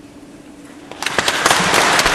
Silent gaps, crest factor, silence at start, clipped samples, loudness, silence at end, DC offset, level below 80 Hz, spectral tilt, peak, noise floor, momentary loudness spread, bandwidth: none; 18 dB; 0.05 s; under 0.1%; -14 LUFS; 0 s; under 0.1%; -42 dBFS; -1.5 dB/octave; 0 dBFS; -39 dBFS; 12 LU; 14.5 kHz